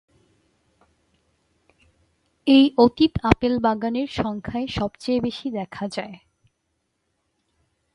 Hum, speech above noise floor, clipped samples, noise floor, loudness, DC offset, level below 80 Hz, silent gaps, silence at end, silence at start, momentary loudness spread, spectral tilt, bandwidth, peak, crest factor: none; 53 dB; under 0.1%; -74 dBFS; -22 LUFS; under 0.1%; -44 dBFS; none; 1.8 s; 2.45 s; 14 LU; -6.5 dB/octave; 11 kHz; 0 dBFS; 24 dB